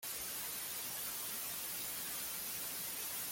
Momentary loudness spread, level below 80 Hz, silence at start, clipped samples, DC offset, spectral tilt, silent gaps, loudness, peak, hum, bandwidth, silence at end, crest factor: 1 LU; -72 dBFS; 0 s; under 0.1%; under 0.1%; 0 dB/octave; none; -40 LUFS; -30 dBFS; none; 17 kHz; 0 s; 12 dB